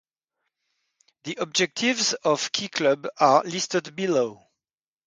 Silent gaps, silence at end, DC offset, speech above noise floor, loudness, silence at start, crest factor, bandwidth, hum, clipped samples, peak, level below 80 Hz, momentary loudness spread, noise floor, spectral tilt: none; 0.7 s; under 0.1%; over 66 dB; -23 LUFS; 1.25 s; 22 dB; 9.6 kHz; none; under 0.1%; -4 dBFS; -74 dBFS; 10 LU; under -90 dBFS; -3 dB/octave